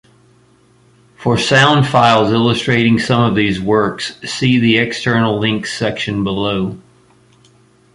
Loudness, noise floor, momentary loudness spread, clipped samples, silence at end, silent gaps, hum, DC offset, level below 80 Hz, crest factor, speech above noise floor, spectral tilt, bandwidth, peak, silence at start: -14 LUFS; -51 dBFS; 9 LU; under 0.1%; 1.15 s; none; none; under 0.1%; -46 dBFS; 14 dB; 37 dB; -5.5 dB/octave; 11.5 kHz; 0 dBFS; 1.2 s